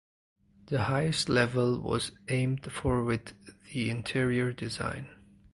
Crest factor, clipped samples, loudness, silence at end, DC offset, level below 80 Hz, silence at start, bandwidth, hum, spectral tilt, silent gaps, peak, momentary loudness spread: 22 dB; under 0.1%; -30 LUFS; 0.4 s; under 0.1%; -52 dBFS; 0.65 s; 11.5 kHz; none; -5.5 dB/octave; none; -10 dBFS; 9 LU